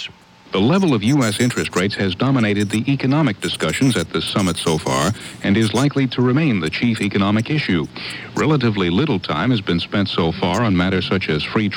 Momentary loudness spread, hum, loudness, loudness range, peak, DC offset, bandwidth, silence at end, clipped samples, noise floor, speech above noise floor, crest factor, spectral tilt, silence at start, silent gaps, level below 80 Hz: 4 LU; none; -18 LUFS; 1 LU; -4 dBFS; under 0.1%; 18.5 kHz; 0 s; under 0.1%; -38 dBFS; 20 dB; 14 dB; -5.5 dB/octave; 0 s; none; -48 dBFS